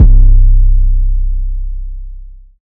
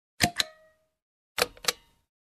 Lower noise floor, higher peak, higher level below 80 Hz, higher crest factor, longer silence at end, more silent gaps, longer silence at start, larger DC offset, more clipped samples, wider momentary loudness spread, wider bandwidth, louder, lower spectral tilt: second, -29 dBFS vs -63 dBFS; first, 0 dBFS vs -4 dBFS; first, -8 dBFS vs -58 dBFS; second, 8 dB vs 30 dB; second, 0.45 s vs 0.6 s; second, none vs 1.02-1.35 s; second, 0 s vs 0.2 s; neither; first, 4% vs under 0.1%; first, 19 LU vs 10 LU; second, 0.6 kHz vs 14 kHz; first, -14 LUFS vs -29 LUFS; first, -13 dB/octave vs -1.5 dB/octave